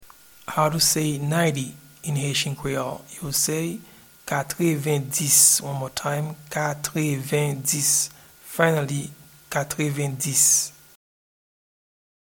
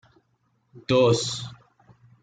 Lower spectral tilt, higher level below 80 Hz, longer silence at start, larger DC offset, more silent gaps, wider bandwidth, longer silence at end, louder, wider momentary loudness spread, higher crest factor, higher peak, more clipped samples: second, -3 dB/octave vs -5 dB/octave; about the same, -58 dBFS vs -60 dBFS; second, 0 s vs 0.75 s; neither; neither; first, 19 kHz vs 9.4 kHz; first, 1.55 s vs 0.7 s; about the same, -22 LUFS vs -23 LUFS; second, 15 LU vs 21 LU; about the same, 22 dB vs 18 dB; first, -2 dBFS vs -8 dBFS; neither